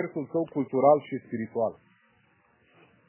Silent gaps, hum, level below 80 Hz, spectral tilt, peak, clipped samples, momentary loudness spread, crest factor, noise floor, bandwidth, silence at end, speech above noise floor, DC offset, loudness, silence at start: none; none; -74 dBFS; -11.5 dB/octave; -8 dBFS; under 0.1%; 12 LU; 20 dB; -65 dBFS; 3.2 kHz; 1.35 s; 38 dB; under 0.1%; -27 LUFS; 0 s